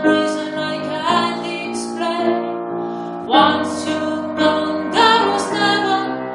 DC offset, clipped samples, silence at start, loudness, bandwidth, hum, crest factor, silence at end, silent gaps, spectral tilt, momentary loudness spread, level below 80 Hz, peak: under 0.1%; under 0.1%; 0 s; -18 LUFS; 11.5 kHz; none; 18 dB; 0 s; none; -4 dB/octave; 11 LU; -64 dBFS; 0 dBFS